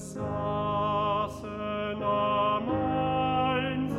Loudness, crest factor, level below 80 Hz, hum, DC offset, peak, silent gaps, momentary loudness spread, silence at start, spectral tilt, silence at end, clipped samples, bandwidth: -28 LUFS; 12 dB; -52 dBFS; none; under 0.1%; -16 dBFS; none; 7 LU; 0 s; -6.5 dB/octave; 0 s; under 0.1%; 13 kHz